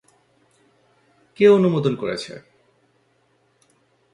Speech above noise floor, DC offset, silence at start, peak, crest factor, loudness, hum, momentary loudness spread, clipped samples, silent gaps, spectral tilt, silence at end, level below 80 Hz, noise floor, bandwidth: 46 dB; under 0.1%; 1.4 s; -4 dBFS; 20 dB; -18 LUFS; none; 21 LU; under 0.1%; none; -7 dB/octave; 1.75 s; -64 dBFS; -63 dBFS; 11 kHz